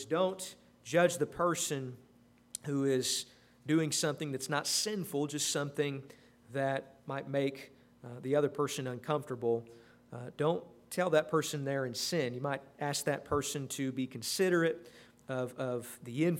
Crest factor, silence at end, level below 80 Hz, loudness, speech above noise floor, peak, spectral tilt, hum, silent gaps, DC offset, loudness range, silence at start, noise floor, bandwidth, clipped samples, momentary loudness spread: 20 dB; 0 s; -72 dBFS; -34 LUFS; 24 dB; -14 dBFS; -4 dB/octave; none; none; under 0.1%; 3 LU; 0 s; -58 dBFS; 16 kHz; under 0.1%; 15 LU